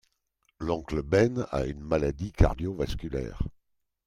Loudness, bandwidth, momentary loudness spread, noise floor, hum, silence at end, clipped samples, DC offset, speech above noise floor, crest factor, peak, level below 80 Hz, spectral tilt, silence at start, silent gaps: -29 LUFS; 12.5 kHz; 11 LU; -74 dBFS; none; 0.55 s; under 0.1%; under 0.1%; 46 dB; 24 dB; -6 dBFS; -38 dBFS; -7.5 dB/octave; 0.6 s; none